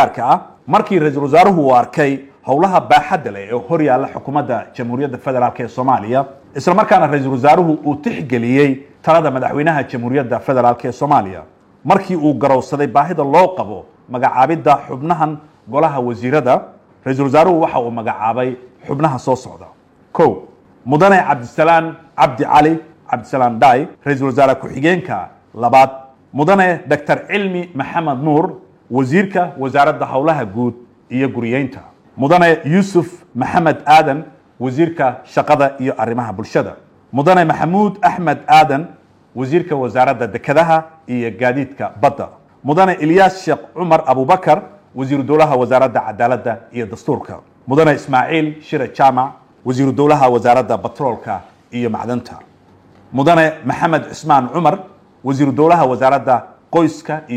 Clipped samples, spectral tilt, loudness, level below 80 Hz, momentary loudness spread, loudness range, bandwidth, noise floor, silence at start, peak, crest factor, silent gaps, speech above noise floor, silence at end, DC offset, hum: under 0.1%; -7 dB/octave; -14 LUFS; -54 dBFS; 12 LU; 3 LU; 13.5 kHz; -47 dBFS; 0 s; 0 dBFS; 14 dB; none; 33 dB; 0 s; under 0.1%; none